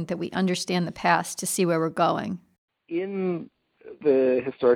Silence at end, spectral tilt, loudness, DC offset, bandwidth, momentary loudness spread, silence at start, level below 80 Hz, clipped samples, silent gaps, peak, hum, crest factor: 0 s; -5 dB/octave; -25 LUFS; under 0.1%; 17 kHz; 10 LU; 0 s; -66 dBFS; under 0.1%; 2.58-2.68 s; -6 dBFS; none; 20 dB